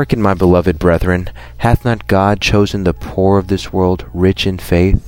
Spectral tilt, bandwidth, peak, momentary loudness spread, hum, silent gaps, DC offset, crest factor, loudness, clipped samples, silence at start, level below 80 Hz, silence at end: -7 dB/octave; 16.5 kHz; 0 dBFS; 6 LU; none; none; under 0.1%; 12 dB; -14 LUFS; under 0.1%; 0 s; -26 dBFS; 0 s